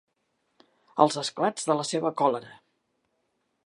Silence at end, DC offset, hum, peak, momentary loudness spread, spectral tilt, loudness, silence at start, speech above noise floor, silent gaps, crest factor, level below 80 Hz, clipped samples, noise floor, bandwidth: 1.15 s; under 0.1%; none; -4 dBFS; 7 LU; -4 dB/octave; -26 LUFS; 0.95 s; 50 dB; none; 24 dB; -80 dBFS; under 0.1%; -76 dBFS; 11.5 kHz